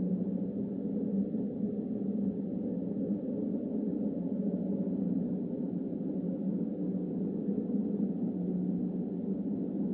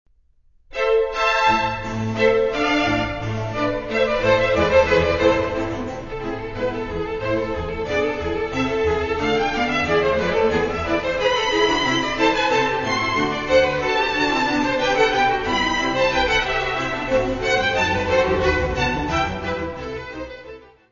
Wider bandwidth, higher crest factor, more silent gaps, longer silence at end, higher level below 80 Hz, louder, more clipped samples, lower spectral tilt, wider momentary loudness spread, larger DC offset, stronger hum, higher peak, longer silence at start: second, 2 kHz vs 7.4 kHz; second, 12 dB vs 18 dB; neither; second, 0 s vs 0.3 s; second, -66 dBFS vs -38 dBFS; second, -34 LUFS vs -20 LUFS; neither; first, -14 dB/octave vs -4.5 dB/octave; second, 2 LU vs 9 LU; neither; neither; second, -20 dBFS vs -2 dBFS; second, 0 s vs 0.7 s